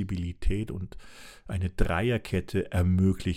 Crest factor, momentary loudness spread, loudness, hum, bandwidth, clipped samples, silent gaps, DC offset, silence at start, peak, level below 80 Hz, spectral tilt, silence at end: 20 dB; 18 LU; -29 LUFS; none; 14 kHz; under 0.1%; none; under 0.1%; 0 s; -8 dBFS; -36 dBFS; -7.5 dB/octave; 0 s